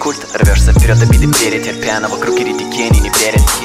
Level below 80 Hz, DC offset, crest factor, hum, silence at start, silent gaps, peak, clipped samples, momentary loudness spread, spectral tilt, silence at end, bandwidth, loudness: -14 dBFS; under 0.1%; 10 dB; none; 0 s; none; -2 dBFS; under 0.1%; 7 LU; -4.5 dB/octave; 0 s; 16 kHz; -12 LUFS